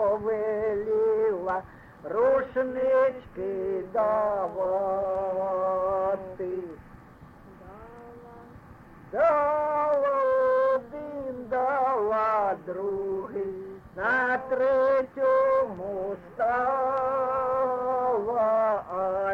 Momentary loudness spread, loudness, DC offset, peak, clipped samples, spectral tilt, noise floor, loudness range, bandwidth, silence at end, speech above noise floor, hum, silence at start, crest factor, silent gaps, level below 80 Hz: 12 LU; -26 LUFS; under 0.1%; -14 dBFS; under 0.1%; -7.5 dB/octave; -50 dBFS; 5 LU; 5.6 kHz; 0 s; 24 dB; none; 0 s; 12 dB; none; -58 dBFS